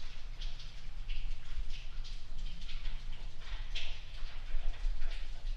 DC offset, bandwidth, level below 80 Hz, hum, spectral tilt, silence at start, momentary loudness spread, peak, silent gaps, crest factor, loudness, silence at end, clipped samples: under 0.1%; 6.6 kHz; -36 dBFS; none; -3.5 dB/octave; 0 s; 7 LU; -20 dBFS; none; 12 dB; -46 LUFS; 0 s; under 0.1%